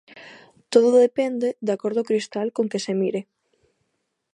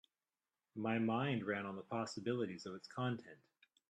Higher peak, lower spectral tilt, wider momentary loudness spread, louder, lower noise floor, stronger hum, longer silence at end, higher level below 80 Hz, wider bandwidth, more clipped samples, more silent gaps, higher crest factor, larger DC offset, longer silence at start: first, -2 dBFS vs -24 dBFS; about the same, -5.5 dB/octave vs -6.5 dB/octave; second, 9 LU vs 12 LU; first, -22 LUFS vs -41 LUFS; second, -75 dBFS vs under -90 dBFS; neither; first, 1.15 s vs 0.55 s; about the same, -78 dBFS vs -82 dBFS; first, 11.5 kHz vs 9.4 kHz; neither; neither; about the same, 20 dB vs 18 dB; neither; second, 0.15 s vs 0.75 s